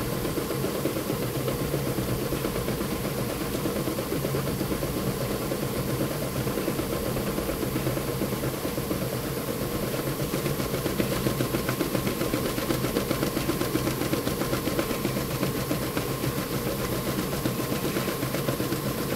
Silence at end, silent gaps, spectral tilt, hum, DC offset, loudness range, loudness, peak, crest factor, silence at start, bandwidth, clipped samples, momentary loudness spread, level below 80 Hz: 0 s; none; -5 dB/octave; none; under 0.1%; 2 LU; -28 LUFS; -8 dBFS; 20 dB; 0 s; 16 kHz; under 0.1%; 2 LU; -44 dBFS